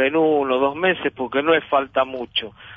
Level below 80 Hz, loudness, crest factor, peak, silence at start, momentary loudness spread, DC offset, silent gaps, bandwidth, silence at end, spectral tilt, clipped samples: -58 dBFS; -20 LUFS; 16 dB; -4 dBFS; 0 s; 6 LU; under 0.1%; none; 5 kHz; 0 s; -7.5 dB/octave; under 0.1%